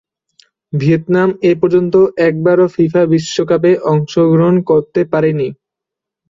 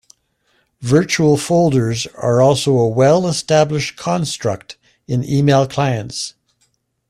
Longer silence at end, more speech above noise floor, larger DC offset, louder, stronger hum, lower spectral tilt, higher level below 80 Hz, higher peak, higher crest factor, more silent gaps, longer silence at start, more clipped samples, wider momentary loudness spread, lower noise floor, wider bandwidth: about the same, 0.75 s vs 0.8 s; first, 71 dB vs 49 dB; neither; first, -13 LUFS vs -16 LUFS; neither; first, -7.5 dB/octave vs -5.5 dB/octave; about the same, -54 dBFS vs -50 dBFS; about the same, -2 dBFS vs -2 dBFS; about the same, 12 dB vs 14 dB; neither; about the same, 0.75 s vs 0.8 s; neither; second, 5 LU vs 10 LU; first, -83 dBFS vs -64 dBFS; second, 7.6 kHz vs 13.5 kHz